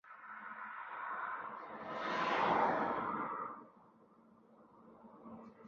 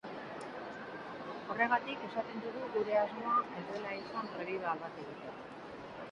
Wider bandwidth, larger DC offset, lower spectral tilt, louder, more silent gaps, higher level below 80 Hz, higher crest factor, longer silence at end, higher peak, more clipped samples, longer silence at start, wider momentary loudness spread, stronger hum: second, 7.4 kHz vs 11 kHz; neither; second, -2.5 dB/octave vs -6 dB/octave; about the same, -39 LUFS vs -38 LUFS; neither; about the same, -76 dBFS vs -74 dBFS; about the same, 20 dB vs 22 dB; about the same, 0 s vs 0 s; second, -20 dBFS vs -16 dBFS; neither; about the same, 0.05 s vs 0.05 s; first, 21 LU vs 14 LU; neither